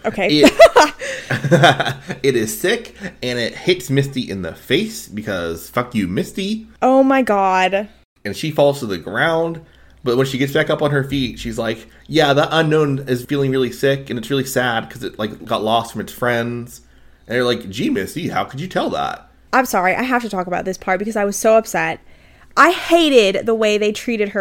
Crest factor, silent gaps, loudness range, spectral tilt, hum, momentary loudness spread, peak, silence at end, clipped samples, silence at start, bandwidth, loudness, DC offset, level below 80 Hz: 18 dB; 8.05-8.16 s; 6 LU; -5 dB/octave; none; 13 LU; 0 dBFS; 0 s; under 0.1%; 0.05 s; 17 kHz; -17 LUFS; under 0.1%; -46 dBFS